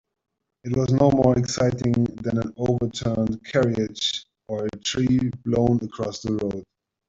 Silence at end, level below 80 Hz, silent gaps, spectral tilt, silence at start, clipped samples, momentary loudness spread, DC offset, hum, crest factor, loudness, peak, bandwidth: 0.45 s; -48 dBFS; none; -6 dB/octave; 0.65 s; under 0.1%; 10 LU; under 0.1%; none; 20 dB; -23 LUFS; -4 dBFS; 7.8 kHz